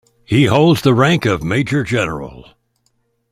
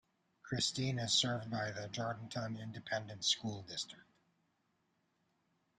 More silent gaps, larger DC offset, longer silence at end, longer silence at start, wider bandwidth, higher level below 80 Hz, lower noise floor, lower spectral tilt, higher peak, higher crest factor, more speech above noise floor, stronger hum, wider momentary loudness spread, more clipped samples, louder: neither; neither; second, 0.9 s vs 1.75 s; second, 0.3 s vs 0.45 s; first, 15.5 kHz vs 13 kHz; first, -44 dBFS vs -72 dBFS; second, -64 dBFS vs -80 dBFS; first, -6.5 dB/octave vs -3 dB/octave; first, -2 dBFS vs -18 dBFS; second, 14 dB vs 22 dB; first, 50 dB vs 41 dB; neither; about the same, 10 LU vs 11 LU; neither; first, -14 LUFS vs -38 LUFS